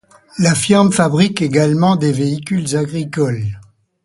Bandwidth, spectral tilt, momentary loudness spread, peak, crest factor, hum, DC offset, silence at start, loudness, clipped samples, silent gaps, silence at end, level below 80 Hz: 11.5 kHz; -5.5 dB/octave; 10 LU; 0 dBFS; 16 dB; none; under 0.1%; 0.35 s; -15 LUFS; under 0.1%; none; 0.4 s; -50 dBFS